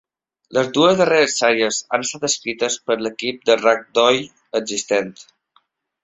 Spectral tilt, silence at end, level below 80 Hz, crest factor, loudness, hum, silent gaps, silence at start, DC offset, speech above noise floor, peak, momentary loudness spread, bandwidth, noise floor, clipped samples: -2.5 dB/octave; 0.8 s; -62 dBFS; 18 dB; -18 LUFS; none; none; 0.5 s; under 0.1%; 44 dB; 0 dBFS; 8 LU; 8.2 kHz; -62 dBFS; under 0.1%